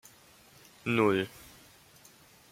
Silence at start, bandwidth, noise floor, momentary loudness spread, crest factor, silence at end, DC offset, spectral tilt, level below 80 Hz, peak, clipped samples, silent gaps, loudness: 0.85 s; 16.5 kHz; -58 dBFS; 25 LU; 22 dB; 1.25 s; under 0.1%; -6 dB/octave; -68 dBFS; -14 dBFS; under 0.1%; none; -30 LUFS